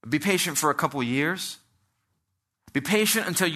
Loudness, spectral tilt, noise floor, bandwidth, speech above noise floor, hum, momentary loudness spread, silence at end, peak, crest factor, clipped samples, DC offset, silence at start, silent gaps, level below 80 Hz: -24 LUFS; -3 dB/octave; -78 dBFS; 14 kHz; 54 dB; none; 10 LU; 0 s; -8 dBFS; 20 dB; under 0.1%; under 0.1%; 0.05 s; none; -68 dBFS